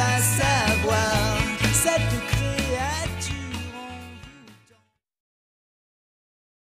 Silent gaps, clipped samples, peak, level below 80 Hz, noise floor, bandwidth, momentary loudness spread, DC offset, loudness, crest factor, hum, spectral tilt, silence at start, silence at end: none; under 0.1%; -8 dBFS; -38 dBFS; -63 dBFS; 15.5 kHz; 17 LU; under 0.1%; -23 LUFS; 18 dB; none; -3.5 dB/octave; 0 s; 2.2 s